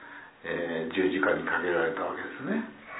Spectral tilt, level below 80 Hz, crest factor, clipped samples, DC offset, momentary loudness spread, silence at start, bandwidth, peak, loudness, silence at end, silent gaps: -9 dB/octave; -66 dBFS; 18 dB; under 0.1%; under 0.1%; 9 LU; 0 s; 4 kHz; -12 dBFS; -29 LUFS; 0 s; none